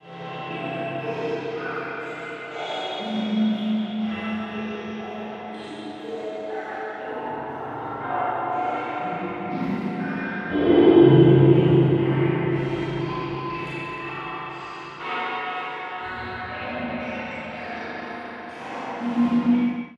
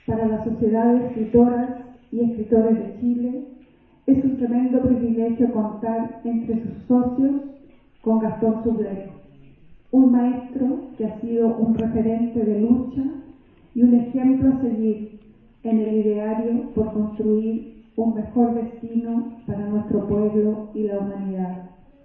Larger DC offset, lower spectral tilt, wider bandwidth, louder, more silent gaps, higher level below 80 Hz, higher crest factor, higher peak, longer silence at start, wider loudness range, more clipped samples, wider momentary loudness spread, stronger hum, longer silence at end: neither; second, -8.5 dB/octave vs -12.5 dB/octave; first, 7.6 kHz vs 3.2 kHz; about the same, -24 LUFS vs -22 LUFS; neither; about the same, -54 dBFS vs -50 dBFS; about the same, 20 dB vs 18 dB; about the same, -4 dBFS vs -4 dBFS; about the same, 0.05 s vs 0.1 s; first, 13 LU vs 3 LU; neither; first, 16 LU vs 11 LU; neither; second, 0 s vs 0.35 s